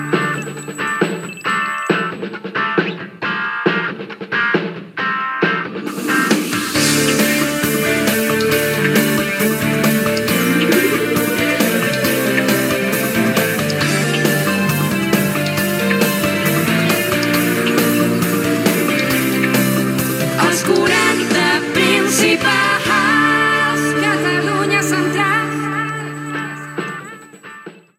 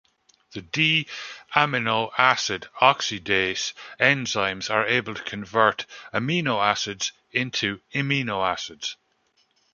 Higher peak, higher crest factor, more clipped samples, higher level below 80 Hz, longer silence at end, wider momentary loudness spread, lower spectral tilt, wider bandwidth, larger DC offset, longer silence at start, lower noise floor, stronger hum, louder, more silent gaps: about the same, 0 dBFS vs -2 dBFS; second, 16 dB vs 24 dB; neither; first, -50 dBFS vs -62 dBFS; second, 0.25 s vs 0.8 s; about the same, 10 LU vs 12 LU; about the same, -4 dB/octave vs -3.5 dB/octave; first, 16.5 kHz vs 7.4 kHz; neither; second, 0 s vs 0.5 s; second, -37 dBFS vs -67 dBFS; neither; first, -16 LUFS vs -23 LUFS; neither